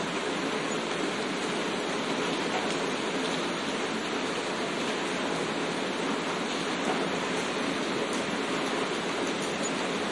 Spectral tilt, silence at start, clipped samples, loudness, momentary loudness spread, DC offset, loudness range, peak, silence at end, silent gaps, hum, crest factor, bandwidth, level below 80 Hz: -3.5 dB/octave; 0 s; under 0.1%; -30 LUFS; 1 LU; under 0.1%; 1 LU; -14 dBFS; 0 s; none; none; 16 dB; 11.5 kHz; -70 dBFS